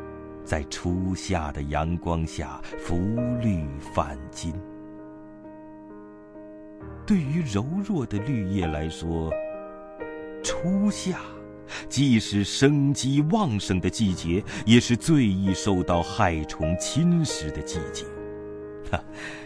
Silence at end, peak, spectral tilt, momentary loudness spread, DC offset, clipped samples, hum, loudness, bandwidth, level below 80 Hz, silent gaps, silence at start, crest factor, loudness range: 0 s; -2 dBFS; -5.5 dB/octave; 21 LU; under 0.1%; under 0.1%; none; -26 LUFS; 11 kHz; -42 dBFS; none; 0 s; 24 dB; 9 LU